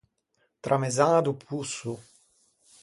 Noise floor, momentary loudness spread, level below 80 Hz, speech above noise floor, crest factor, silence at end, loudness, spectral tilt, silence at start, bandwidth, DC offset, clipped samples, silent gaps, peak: -73 dBFS; 16 LU; -70 dBFS; 47 dB; 22 dB; 0.8 s; -27 LUFS; -5 dB/octave; 0.65 s; 11.5 kHz; under 0.1%; under 0.1%; none; -8 dBFS